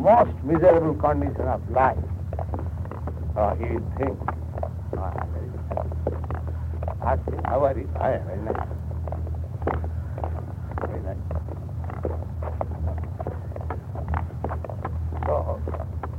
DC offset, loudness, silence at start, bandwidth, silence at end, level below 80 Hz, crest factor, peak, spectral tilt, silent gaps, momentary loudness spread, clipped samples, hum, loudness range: under 0.1%; -27 LUFS; 0 s; 4.2 kHz; 0 s; -34 dBFS; 20 dB; -6 dBFS; -10 dB/octave; none; 10 LU; under 0.1%; none; 7 LU